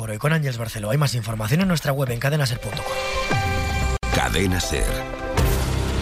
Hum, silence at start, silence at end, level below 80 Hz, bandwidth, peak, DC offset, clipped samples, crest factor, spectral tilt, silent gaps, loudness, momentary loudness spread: none; 0 s; 0 s; -30 dBFS; 16 kHz; -6 dBFS; under 0.1%; under 0.1%; 16 dB; -5 dB/octave; none; -23 LUFS; 5 LU